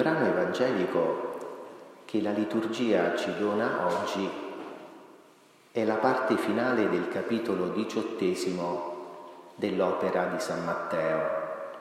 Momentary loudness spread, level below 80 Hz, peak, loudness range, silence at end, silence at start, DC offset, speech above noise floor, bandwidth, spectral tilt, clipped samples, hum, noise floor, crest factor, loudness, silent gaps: 15 LU; -76 dBFS; -10 dBFS; 2 LU; 0 s; 0 s; under 0.1%; 30 dB; 15 kHz; -5.5 dB/octave; under 0.1%; none; -58 dBFS; 20 dB; -29 LUFS; none